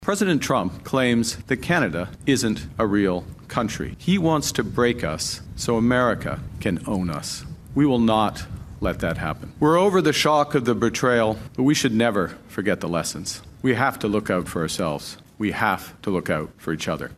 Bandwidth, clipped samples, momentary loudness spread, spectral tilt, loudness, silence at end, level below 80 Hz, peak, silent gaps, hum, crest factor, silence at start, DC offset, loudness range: 15 kHz; under 0.1%; 10 LU; -5 dB/octave; -23 LUFS; 0.05 s; -44 dBFS; -4 dBFS; none; none; 18 dB; 0 s; under 0.1%; 4 LU